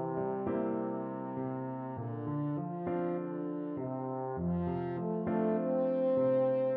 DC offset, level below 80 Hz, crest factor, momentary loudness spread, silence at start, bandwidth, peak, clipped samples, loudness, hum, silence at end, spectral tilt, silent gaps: under 0.1%; -64 dBFS; 14 dB; 9 LU; 0 s; 4.1 kHz; -20 dBFS; under 0.1%; -34 LUFS; none; 0 s; -9.5 dB/octave; none